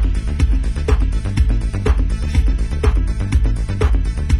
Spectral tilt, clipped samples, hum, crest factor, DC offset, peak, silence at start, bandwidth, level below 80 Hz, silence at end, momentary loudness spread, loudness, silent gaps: -7 dB/octave; under 0.1%; none; 12 dB; under 0.1%; -4 dBFS; 0 s; 11 kHz; -16 dBFS; 0 s; 2 LU; -19 LUFS; none